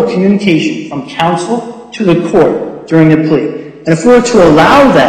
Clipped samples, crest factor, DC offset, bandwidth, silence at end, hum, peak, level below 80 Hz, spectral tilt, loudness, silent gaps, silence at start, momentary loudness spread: 0.3%; 8 dB; under 0.1%; 12.5 kHz; 0 s; none; 0 dBFS; -38 dBFS; -6 dB/octave; -9 LUFS; none; 0 s; 14 LU